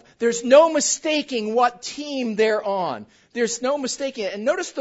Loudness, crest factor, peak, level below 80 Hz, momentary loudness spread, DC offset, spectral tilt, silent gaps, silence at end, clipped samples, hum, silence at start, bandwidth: -21 LUFS; 20 dB; -2 dBFS; -68 dBFS; 13 LU; under 0.1%; -2.5 dB/octave; none; 0 s; under 0.1%; none; 0.2 s; 8 kHz